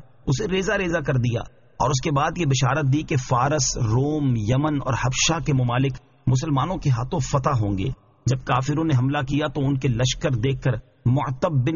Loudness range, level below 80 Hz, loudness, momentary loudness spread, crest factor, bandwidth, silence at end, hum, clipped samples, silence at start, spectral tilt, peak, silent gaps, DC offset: 2 LU; -40 dBFS; -23 LUFS; 5 LU; 14 dB; 7.4 kHz; 0 s; none; under 0.1%; 0.25 s; -5.5 dB/octave; -8 dBFS; none; under 0.1%